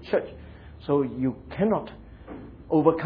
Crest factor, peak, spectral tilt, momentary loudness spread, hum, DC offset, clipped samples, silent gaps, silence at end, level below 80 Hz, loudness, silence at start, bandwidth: 22 dB; -6 dBFS; -10.5 dB/octave; 21 LU; none; under 0.1%; under 0.1%; none; 0 s; -50 dBFS; -26 LUFS; 0 s; 5.2 kHz